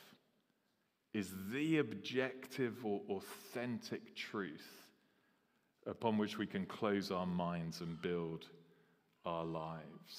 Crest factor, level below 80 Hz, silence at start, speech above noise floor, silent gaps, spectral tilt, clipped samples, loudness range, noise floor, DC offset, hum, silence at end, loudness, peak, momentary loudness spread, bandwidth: 22 dB; -78 dBFS; 0 s; 40 dB; none; -6 dB/octave; under 0.1%; 4 LU; -82 dBFS; under 0.1%; none; 0 s; -42 LUFS; -22 dBFS; 12 LU; 15.5 kHz